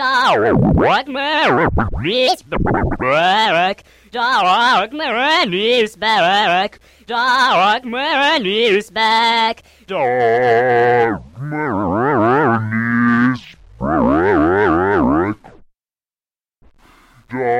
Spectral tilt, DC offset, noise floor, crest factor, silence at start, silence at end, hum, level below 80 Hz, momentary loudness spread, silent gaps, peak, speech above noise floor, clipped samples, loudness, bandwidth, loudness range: -5.5 dB/octave; under 0.1%; under -90 dBFS; 12 dB; 0 s; 0 s; none; -34 dBFS; 8 LU; none; -4 dBFS; over 75 dB; under 0.1%; -15 LUFS; 15.5 kHz; 2 LU